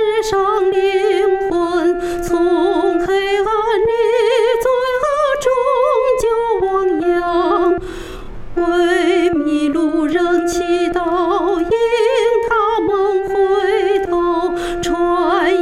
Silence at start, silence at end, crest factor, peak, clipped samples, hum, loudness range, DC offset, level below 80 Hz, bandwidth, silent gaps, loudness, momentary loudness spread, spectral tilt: 0 s; 0 s; 12 dB; -4 dBFS; under 0.1%; none; 1 LU; under 0.1%; -38 dBFS; 13.5 kHz; none; -15 LUFS; 3 LU; -4.5 dB/octave